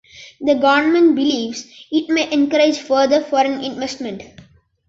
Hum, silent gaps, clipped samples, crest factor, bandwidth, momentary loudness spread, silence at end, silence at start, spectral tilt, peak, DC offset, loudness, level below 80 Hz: none; none; under 0.1%; 16 dB; 7.8 kHz; 13 LU; 0.65 s; 0.15 s; -3.5 dB/octave; -2 dBFS; under 0.1%; -17 LUFS; -58 dBFS